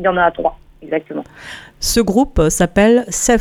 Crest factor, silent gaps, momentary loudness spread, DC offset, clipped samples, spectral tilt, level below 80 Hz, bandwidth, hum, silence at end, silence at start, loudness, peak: 14 dB; none; 17 LU; under 0.1%; under 0.1%; -4 dB/octave; -30 dBFS; 17.5 kHz; none; 0 s; 0 s; -15 LUFS; 0 dBFS